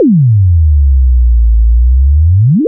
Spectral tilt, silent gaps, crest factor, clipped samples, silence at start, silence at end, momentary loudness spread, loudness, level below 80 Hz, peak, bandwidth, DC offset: -21.5 dB/octave; none; 4 dB; under 0.1%; 0 s; 0 s; 2 LU; -9 LUFS; -8 dBFS; -2 dBFS; 0.6 kHz; under 0.1%